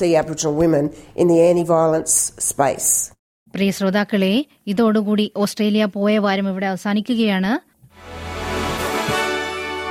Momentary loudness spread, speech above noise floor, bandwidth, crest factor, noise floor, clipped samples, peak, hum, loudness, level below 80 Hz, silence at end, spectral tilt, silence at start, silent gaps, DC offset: 9 LU; 21 dB; 16.5 kHz; 16 dB; -39 dBFS; under 0.1%; -4 dBFS; none; -19 LUFS; -48 dBFS; 0 s; -4 dB/octave; 0 s; 3.19-3.46 s; under 0.1%